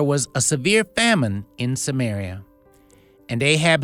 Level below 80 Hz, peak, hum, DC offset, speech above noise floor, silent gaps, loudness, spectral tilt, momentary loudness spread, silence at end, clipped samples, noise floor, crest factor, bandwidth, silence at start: -54 dBFS; -2 dBFS; none; under 0.1%; 33 dB; none; -20 LUFS; -4 dB/octave; 12 LU; 0 s; under 0.1%; -53 dBFS; 18 dB; 16 kHz; 0 s